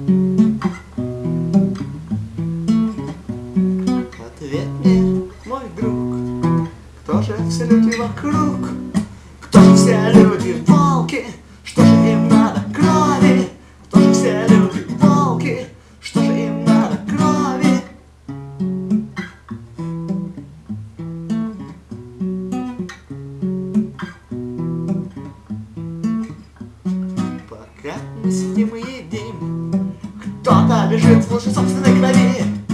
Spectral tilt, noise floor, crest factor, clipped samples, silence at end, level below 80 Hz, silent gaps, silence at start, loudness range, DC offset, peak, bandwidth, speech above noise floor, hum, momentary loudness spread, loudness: -7 dB/octave; -37 dBFS; 16 dB; under 0.1%; 0 s; -44 dBFS; none; 0 s; 12 LU; under 0.1%; 0 dBFS; 11.5 kHz; 21 dB; none; 19 LU; -16 LUFS